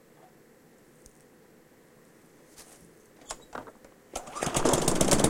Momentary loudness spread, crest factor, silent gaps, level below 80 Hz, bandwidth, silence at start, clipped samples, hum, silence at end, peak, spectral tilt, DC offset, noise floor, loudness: 27 LU; 28 dB; none; -48 dBFS; 16.5 kHz; 2.6 s; under 0.1%; none; 0 s; -4 dBFS; -3.5 dB/octave; under 0.1%; -58 dBFS; -29 LUFS